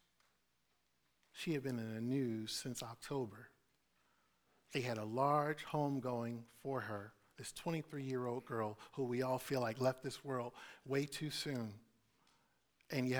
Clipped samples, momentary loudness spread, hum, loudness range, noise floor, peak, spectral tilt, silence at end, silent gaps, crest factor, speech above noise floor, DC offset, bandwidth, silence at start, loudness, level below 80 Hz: under 0.1%; 11 LU; none; 3 LU; -82 dBFS; -22 dBFS; -5.5 dB/octave; 0 s; none; 20 dB; 41 dB; under 0.1%; over 20 kHz; 1.35 s; -42 LUFS; -76 dBFS